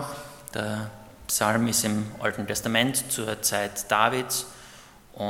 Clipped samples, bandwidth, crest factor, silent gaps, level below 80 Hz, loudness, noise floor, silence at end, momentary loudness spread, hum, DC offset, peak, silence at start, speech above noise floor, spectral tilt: under 0.1%; 17.5 kHz; 24 dB; none; -58 dBFS; -25 LUFS; -49 dBFS; 0 s; 15 LU; none; under 0.1%; -4 dBFS; 0 s; 23 dB; -3 dB/octave